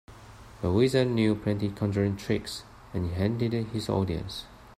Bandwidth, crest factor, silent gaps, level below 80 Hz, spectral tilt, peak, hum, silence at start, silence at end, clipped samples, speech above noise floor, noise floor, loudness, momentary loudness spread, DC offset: 14.5 kHz; 18 dB; none; -52 dBFS; -7 dB/octave; -10 dBFS; none; 0.1 s; 0.05 s; under 0.1%; 21 dB; -48 dBFS; -28 LUFS; 14 LU; under 0.1%